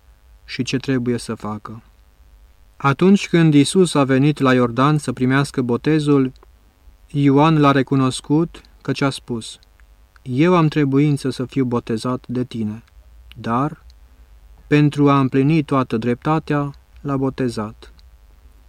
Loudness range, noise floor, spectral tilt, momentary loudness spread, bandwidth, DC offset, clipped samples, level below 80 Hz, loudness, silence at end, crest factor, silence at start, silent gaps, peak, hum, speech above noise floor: 6 LU; -49 dBFS; -6.5 dB/octave; 14 LU; 12.5 kHz; under 0.1%; under 0.1%; -48 dBFS; -18 LUFS; 0.8 s; 16 dB; 0.5 s; none; -4 dBFS; none; 32 dB